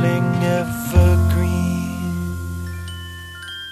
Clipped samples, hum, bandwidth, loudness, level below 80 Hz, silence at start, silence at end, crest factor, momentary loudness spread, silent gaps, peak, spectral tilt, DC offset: under 0.1%; none; 14 kHz; -20 LUFS; -28 dBFS; 0 s; 0 s; 16 dB; 16 LU; none; -2 dBFS; -6.5 dB/octave; under 0.1%